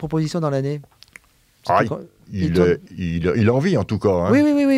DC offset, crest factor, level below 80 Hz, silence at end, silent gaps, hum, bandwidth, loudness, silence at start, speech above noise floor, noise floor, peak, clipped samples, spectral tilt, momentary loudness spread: under 0.1%; 16 dB; -46 dBFS; 0 s; none; none; 13.5 kHz; -19 LUFS; 0 s; 35 dB; -53 dBFS; -2 dBFS; under 0.1%; -7.5 dB/octave; 12 LU